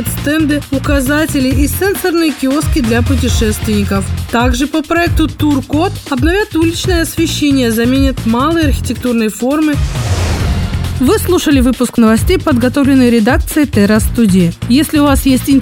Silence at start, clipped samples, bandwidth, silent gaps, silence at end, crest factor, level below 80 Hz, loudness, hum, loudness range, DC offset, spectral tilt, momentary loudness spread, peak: 0 s; under 0.1%; 19 kHz; none; 0 s; 12 dB; -22 dBFS; -12 LUFS; none; 3 LU; under 0.1%; -5.5 dB/octave; 5 LU; 0 dBFS